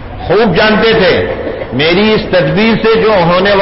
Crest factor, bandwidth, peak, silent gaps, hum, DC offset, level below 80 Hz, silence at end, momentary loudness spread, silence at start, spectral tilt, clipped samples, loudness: 8 dB; 5.8 kHz; 0 dBFS; none; none; under 0.1%; -30 dBFS; 0 s; 6 LU; 0 s; -9.5 dB/octave; under 0.1%; -9 LUFS